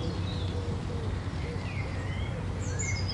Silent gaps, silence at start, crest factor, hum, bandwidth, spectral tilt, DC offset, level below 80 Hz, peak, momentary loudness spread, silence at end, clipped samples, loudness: none; 0 s; 12 dB; none; 11 kHz; -5 dB/octave; under 0.1%; -40 dBFS; -20 dBFS; 3 LU; 0 s; under 0.1%; -34 LUFS